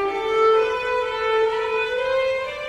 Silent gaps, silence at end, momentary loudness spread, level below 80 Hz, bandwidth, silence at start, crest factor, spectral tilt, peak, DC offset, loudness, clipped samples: none; 0 s; 5 LU; -52 dBFS; 9.8 kHz; 0 s; 12 dB; -3 dB/octave; -8 dBFS; under 0.1%; -21 LUFS; under 0.1%